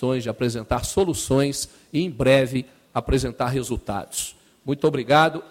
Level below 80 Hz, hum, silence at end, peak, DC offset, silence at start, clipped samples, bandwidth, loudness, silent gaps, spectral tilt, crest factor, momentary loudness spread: -40 dBFS; none; 0.05 s; -4 dBFS; under 0.1%; 0 s; under 0.1%; 16.5 kHz; -23 LUFS; none; -5 dB/octave; 20 dB; 12 LU